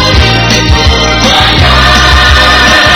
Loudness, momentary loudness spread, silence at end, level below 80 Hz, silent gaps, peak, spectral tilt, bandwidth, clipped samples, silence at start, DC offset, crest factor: -4 LUFS; 3 LU; 0 s; -12 dBFS; none; 0 dBFS; -3.5 dB/octave; 17.5 kHz; 8%; 0 s; under 0.1%; 4 dB